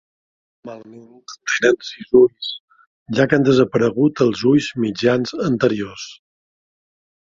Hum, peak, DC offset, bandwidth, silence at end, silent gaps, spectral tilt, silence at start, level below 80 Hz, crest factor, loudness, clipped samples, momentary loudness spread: none; 0 dBFS; under 0.1%; 7.6 kHz; 1.1 s; 2.60-2.68 s, 2.87-3.06 s; -5.5 dB/octave; 0.65 s; -56 dBFS; 18 dB; -17 LUFS; under 0.1%; 20 LU